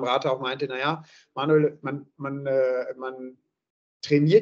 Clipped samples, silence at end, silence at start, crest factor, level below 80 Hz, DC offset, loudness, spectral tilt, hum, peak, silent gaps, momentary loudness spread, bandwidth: under 0.1%; 0 s; 0 s; 20 dB; -76 dBFS; under 0.1%; -26 LUFS; -7 dB/octave; none; -6 dBFS; 3.70-4.00 s; 15 LU; 7.6 kHz